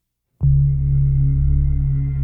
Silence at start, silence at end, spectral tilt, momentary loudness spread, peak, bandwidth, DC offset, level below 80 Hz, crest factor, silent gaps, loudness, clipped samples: 0.4 s; 0 s; -14 dB/octave; 4 LU; -6 dBFS; 2.2 kHz; under 0.1%; -20 dBFS; 12 dB; none; -18 LUFS; under 0.1%